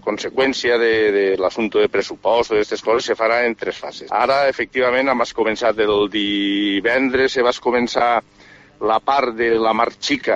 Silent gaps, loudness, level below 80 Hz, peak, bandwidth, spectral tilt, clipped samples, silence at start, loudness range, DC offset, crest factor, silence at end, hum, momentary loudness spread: none; -18 LUFS; -52 dBFS; -2 dBFS; 8 kHz; -4 dB/octave; under 0.1%; 0.05 s; 1 LU; under 0.1%; 16 dB; 0 s; none; 4 LU